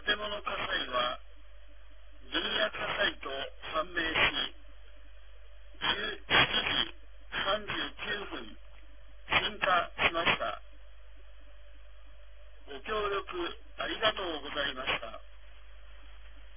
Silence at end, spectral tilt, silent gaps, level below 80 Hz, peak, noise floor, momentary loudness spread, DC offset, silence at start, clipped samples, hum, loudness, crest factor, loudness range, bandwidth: 0 s; 0 dB/octave; none; -52 dBFS; -12 dBFS; -54 dBFS; 12 LU; 0.5%; 0 s; under 0.1%; none; -31 LUFS; 24 dB; 5 LU; 3.7 kHz